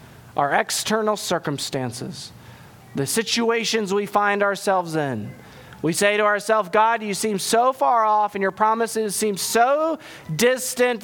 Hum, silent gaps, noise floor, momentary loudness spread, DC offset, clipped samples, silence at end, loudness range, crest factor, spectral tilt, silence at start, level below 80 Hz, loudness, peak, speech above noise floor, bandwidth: none; none; -44 dBFS; 11 LU; under 0.1%; under 0.1%; 0 s; 4 LU; 18 dB; -3.5 dB/octave; 0 s; -62 dBFS; -21 LUFS; -4 dBFS; 23 dB; 19 kHz